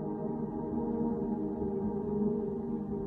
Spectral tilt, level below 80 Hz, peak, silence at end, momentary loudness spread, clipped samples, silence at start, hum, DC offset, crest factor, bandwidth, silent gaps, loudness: -12.5 dB/octave; -54 dBFS; -20 dBFS; 0 s; 4 LU; under 0.1%; 0 s; none; under 0.1%; 14 dB; 2.1 kHz; none; -34 LUFS